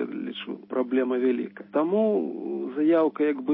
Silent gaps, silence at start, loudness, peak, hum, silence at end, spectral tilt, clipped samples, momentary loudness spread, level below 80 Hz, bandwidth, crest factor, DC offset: none; 0 s; -26 LUFS; -12 dBFS; none; 0 s; -10.5 dB/octave; under 0.1%; 10 LU; -82 dBFS; 4.2 kHz; 14 dB; under 0.1%